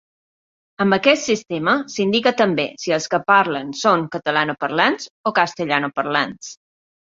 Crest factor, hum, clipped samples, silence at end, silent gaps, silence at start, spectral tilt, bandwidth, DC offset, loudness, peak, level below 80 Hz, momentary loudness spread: 20 dB; none; under 0.1%; 0.65 s; 5.10-5.24 s; 0.8 s; -4 dB/octave; 7.8 kHz; under 0.1%; -19 LUFS; 0 dBFS; -64 dBFS; 6 LU